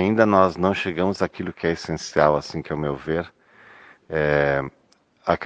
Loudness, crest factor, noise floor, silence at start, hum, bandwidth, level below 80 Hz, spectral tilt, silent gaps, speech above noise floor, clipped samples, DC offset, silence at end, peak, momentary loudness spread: -22 LUFS; 22 dB; -57 dBFS; 0 s; none; 9.2 kHz; -50 dBFS; -6 dB/octave; none; 36 dB; under 0.1%; under 0.1%; 0 s; 0 dBFS; 12 LU